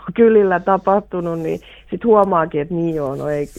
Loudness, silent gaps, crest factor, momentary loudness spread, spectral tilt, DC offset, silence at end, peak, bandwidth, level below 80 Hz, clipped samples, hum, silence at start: -17 LUFS; none; 16 dB; 11 LU; -8.5 dB/octave; under 0.1%; 0 s; 0 dBFS; 8.8 kHz; -46 dBFS; under 0.1%; none; 0 s